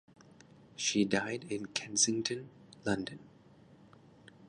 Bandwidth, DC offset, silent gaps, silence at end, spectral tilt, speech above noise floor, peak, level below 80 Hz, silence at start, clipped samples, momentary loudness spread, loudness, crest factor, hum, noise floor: 11 kHz; under 0.1%; none; 0 s; -2.5 dB/octave; 26 dB; -14 dBFS; -68 dBFS; 0.8 s; under 0.1%; 18 LU; -33 LUFS; 24 dB; none; -60 dBFS